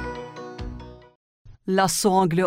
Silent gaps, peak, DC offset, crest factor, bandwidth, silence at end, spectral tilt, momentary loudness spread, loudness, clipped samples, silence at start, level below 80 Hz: 1.15-1.45 s; -6 dBFS; under 0.1%; 18 dB; 16 kHz; 0 s; -4.5 dB/octave; 19 LU; -21 LUFS; under 0.1%; 0 s; -44 dBFS